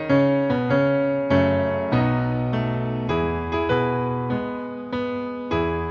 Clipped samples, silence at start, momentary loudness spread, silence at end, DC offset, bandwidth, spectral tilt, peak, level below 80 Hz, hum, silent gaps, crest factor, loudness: under 0.1%; 0 s; 8 LU; 0 s; under 0.1%; 6.6 kHz; -9 dB/octave; -8 dBFS; -44 dBFS; none; none; 14 dB; -23 LUFS